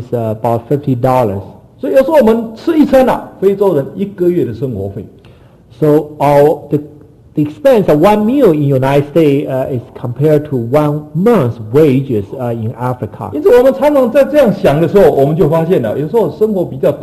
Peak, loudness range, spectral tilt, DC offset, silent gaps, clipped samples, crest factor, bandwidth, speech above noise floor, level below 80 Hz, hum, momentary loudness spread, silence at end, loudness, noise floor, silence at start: 0 dBFS; 4 LU; -8.5 dB/octave; under 0.1%; none; under 0.1%; 12 dB; 14.5 kHz; 30 dB; -40 dBFS; none; 10 LU; 0 s; -11 LUFS; -40 dBFS; 0 s